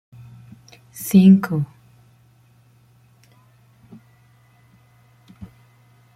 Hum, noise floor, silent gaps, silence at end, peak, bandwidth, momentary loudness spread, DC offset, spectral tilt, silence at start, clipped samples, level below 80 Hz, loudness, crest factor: none; -54 dBFS; none; 0.7 s; -4 dBFS; 16 kHz; 20 LU; under 0.1%; -7.5 dB/octave; 1 s; under 0.1%; -62 dBFS; -16 LUFS; 20 dB